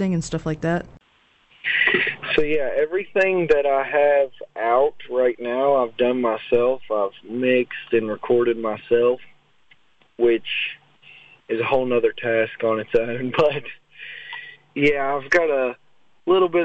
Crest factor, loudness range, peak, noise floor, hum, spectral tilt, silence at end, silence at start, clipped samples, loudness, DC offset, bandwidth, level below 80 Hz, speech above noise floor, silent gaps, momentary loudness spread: 16 dB; 3 LU; -6 dBFS; -59 dBFS; none; -6 dB/octave; 0 s; 0 s; under 0.1%; -21 LUFS; under 0.1%; 8.2 kHz; -52 dBFS; 39 dB; none; 11 LU